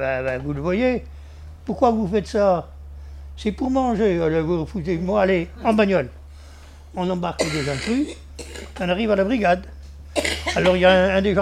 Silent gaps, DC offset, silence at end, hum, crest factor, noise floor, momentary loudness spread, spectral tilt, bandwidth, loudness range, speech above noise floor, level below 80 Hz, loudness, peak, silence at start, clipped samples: none; under 0.1%; 0 s; none; 18 dB; -42 dBFS; 19 LU; -5.5 dB/octave; 14.5 kHz; 3 LU; 22 dB; -38 dBFS; -21 LUFS; -2 dBFS; 0 s; under 0.1%